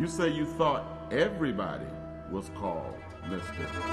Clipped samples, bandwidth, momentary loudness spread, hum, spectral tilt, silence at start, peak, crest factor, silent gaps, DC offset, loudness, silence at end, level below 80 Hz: under 0.1%; 12.5 kHz; 11 LU; none; -6 dB/octave; 0 s; -14 dBFS; 18 dB; none; under 0.1%; -32 LUFS; 0 s; -50 dBFS